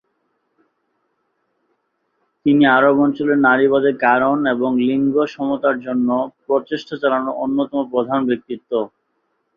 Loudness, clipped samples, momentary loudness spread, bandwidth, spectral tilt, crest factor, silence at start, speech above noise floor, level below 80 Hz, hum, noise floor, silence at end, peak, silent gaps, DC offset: -17 LUFS; under 0.1%; 10 LU; 6.6 kHz; -7.5 dB/octave; 16 dB; 2.45 s; 52 dB; -62 dBFS; none; -69 dBFS; 0.7 s; -2 dBFS; none; under 0.1%